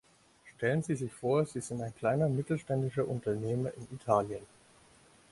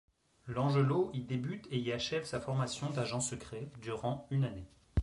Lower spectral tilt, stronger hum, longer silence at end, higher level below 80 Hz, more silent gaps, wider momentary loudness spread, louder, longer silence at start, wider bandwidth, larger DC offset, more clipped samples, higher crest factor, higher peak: first, -7 dB/octave vs -5.5 dB/octave; neither; first, 0.85 s vs 0 s; second, -64 dBFS vs -50 dBFS; neither; second, 9 LU vs 12 LU; first, -33 LUFS vs -36 LUFS; about the same, 0.45 s vs 0.45 s; about the same, 11.5 kHz vs 11.5 kHz; neither; neither; first, 22 dB vs 16 dB; first, -12 dBFS vs -18 dBFS